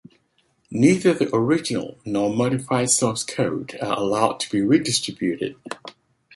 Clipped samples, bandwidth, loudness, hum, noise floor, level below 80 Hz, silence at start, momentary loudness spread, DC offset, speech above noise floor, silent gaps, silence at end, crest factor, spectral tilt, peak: under 0.1%; 11.5 kHz; -21 LUFS; none; -65 dBFS; -60 dBFS; 0.7 s; 11 LU; under 0.1%; 44 dB; none; 0.45 s; 20 dB; -4.5 dB/octave; -2 dBFS